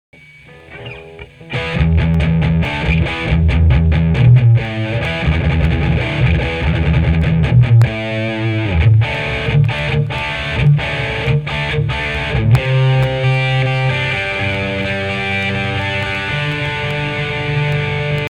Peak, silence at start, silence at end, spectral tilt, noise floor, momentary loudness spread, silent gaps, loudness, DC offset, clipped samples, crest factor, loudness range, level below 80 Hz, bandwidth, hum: -2 dBFS; 0.5 s; 0 s; -7.5 dB/octave; -40 dBFS; 6 LU; none; -15 LUFS; 0.3%; under 0.1%; 14 dB; 4 LU; -24 dBFS; 9.4 kHz; none